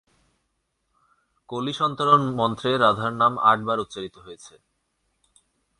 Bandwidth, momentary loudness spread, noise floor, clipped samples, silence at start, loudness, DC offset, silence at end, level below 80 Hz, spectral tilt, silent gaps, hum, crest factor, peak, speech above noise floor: 11 kHz; 17 LU; -75 dBFS; under 0.1%; 1.5 s; -21 LUFS; under 0.1%; 1.3 s; -62 dBFS; -5.5 dB/octave; none; none; 20 dB; -4 dBFS; 52 dB